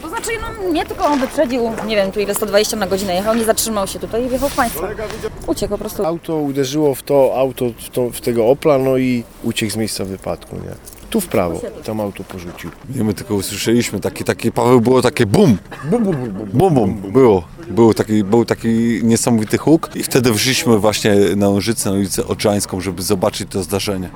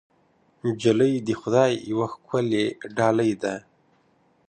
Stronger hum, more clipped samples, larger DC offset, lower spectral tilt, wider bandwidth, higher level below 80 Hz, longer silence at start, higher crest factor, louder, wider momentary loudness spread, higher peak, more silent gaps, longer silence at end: neither; neither; neither; about the same, -5 dB/octave vs -6 dB/octave; first, over 20 kHz vs 9.4 kHz; first, -40 dBFS vs -64 dBFS; second, 0 s vs 0.65 s; about the same, 16 dB vs 20 dB; first, -16 LUFS vs -24 LUFS; about the same, 10 LU vs 9 LU; first, 0 dBFS vs -4 dBFS; neither; second, 0 s vs 0.9 s